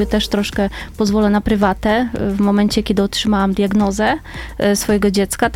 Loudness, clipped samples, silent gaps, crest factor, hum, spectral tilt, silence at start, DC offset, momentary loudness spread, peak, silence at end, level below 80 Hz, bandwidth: -16 LUFS; under 0.1%; none; 16 dB; none; -5 dB/octave; 0 s; under 0.1%; 5 LU; 0 dBFS; 0 s; -32 dBFS; 16 kHz